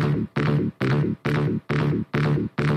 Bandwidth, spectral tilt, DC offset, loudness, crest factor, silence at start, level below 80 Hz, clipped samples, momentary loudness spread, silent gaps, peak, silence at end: 6.6 kHz; -8.5 dB/octave; under 0.1%; -24 LUFS; 14 dB; 0 s; -46 dBFS; under 0.1%; 1 LU; none; -8 dBFS; 0 s